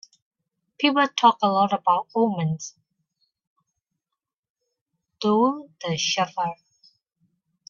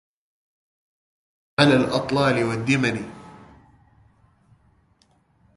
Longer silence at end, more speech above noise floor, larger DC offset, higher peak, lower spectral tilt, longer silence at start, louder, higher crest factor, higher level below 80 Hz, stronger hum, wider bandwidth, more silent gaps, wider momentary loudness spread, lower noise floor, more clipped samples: second, 1.15 s vs 2.25 s; first, 65 dB vs 42 dB; neither; about the same, -4 dBFS vs -2 dBFS; about the same, -4.5 dB/octave vs -5.5 dB/octave; second, 0.8 s vs 1.6 s; about the same, -22 LUFS vs -21 LUFS; about the same, 22 dB vs 24 dB; second, -72 dBFS vs -56 dBFS; neither; second, 7.4 kHz vs 11.5 kHz; first, 3.47-3.56 s, 4.39-4.43 s, 4.50-4.55 s, 4.81-4.86 s vs none; second, 11 LU vs 16 LU; first, -86 dBFS vs -62 dBFS; neither